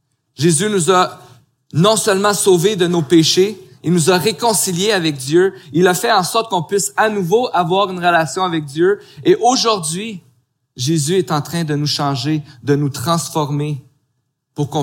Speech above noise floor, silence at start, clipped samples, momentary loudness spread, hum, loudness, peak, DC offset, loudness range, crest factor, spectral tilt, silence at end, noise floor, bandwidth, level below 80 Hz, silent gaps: 54 dB; 0.4 s; under 0.1%; 9 LU; none; -15 LUFS; 0 dBFS; under 0.1%; 5 LU; 16 dB; -4.5 dB/octave; 0 s; -69 dBFS; 17 kHz; -62 dBFS; none